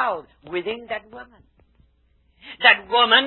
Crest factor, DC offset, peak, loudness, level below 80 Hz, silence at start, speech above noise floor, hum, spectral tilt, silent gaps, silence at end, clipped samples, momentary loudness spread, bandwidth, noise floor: 22 dB; under 0.1%; 0 dBFS; -19 LUFS; -60 dBFS; 0 s; 40 dB; none; -6.5 dB/octave; none; 0 s; under 0.1%; 17 LU; 4.3 kHz; -62 dBFS